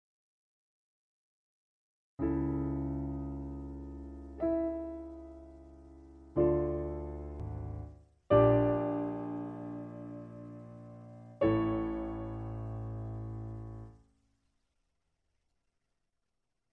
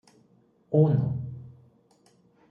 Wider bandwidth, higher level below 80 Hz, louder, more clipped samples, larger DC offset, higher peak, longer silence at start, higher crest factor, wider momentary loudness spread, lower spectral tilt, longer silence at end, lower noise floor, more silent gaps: first, 4.2 kHz vs 3.2 kHz; first, -50 dBFS vs -64 dBFS; second, -34 LUFS vs -25 LUFS; neither; neither; second, -14 dBFS vs -10 dBFS; first, 2.2 s vs 0.7 s; about the same, 24 dB vs 20 dB; first, 21 LU vs 18 LU; about the same, -10.5 dB/octave vs -11.5 dB/octave; first, 2.75 s vs 1 s; first, -86 dBFS vs -63 dBFS; neither